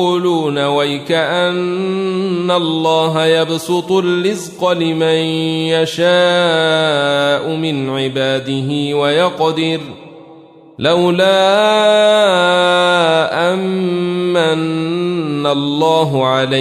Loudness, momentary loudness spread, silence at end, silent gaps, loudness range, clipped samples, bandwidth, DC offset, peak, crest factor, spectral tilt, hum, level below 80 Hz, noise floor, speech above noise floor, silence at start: -14 LUFS; 7 LU; 0 s; none; 4 LU; under 0.1%; 14.5 kHz; under 0.1%; -2 dBFS; 12 dB; -5 dB/octave; none; -60 dBFS; -40 dBFS; 26 dB; 0 s